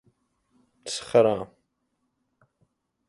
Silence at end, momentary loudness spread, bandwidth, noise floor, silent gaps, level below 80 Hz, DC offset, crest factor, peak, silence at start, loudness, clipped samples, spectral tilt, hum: 1.65 s; 21 LU; 11.5 kHz; -76 dBFS; none; -66 dBFS; under 0.1%; 22 dB; -6 dBFS; 0.85 s; -24 LUFS; under 0.1%; -4.5 dB/octave; none